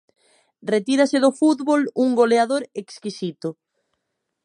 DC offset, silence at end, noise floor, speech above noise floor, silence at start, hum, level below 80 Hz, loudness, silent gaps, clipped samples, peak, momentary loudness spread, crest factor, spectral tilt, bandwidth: under 0.1%; 0.95 s; -77 dBFS; 58 dB; 0.65 s; none; -76 dBFS; -20 LUFS; none; under 0.1%; -4 dBFS; 15 LU; 18 dB; -5 dB/octave; 11 kHz